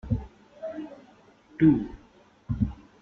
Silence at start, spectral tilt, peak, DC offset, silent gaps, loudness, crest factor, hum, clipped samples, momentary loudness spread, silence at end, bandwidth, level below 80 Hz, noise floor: 0.05 s; -10.5 dB/octave; -8 dBFS; under 0.1%; none; -27 LUFS; 20 dB; none; under 0.1%; 22 LU; 0.25 s; 4.3 kHz; -44 dBFS; -57 dBFS